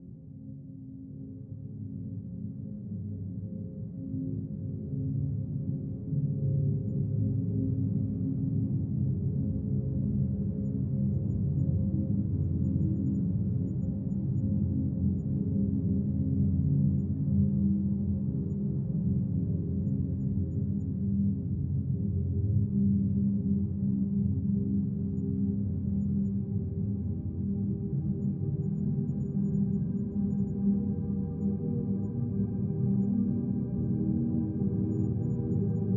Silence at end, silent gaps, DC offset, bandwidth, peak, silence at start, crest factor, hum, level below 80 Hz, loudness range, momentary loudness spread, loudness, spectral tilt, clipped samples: 0 s; none; under 0.1%; 1.7 kHz; -16 dBFS; 0 s; 14 dB; none; -48 dBFS; 6 LU; 10 LU; -31 LUFS; -14.5 dB/octave; under 0.1%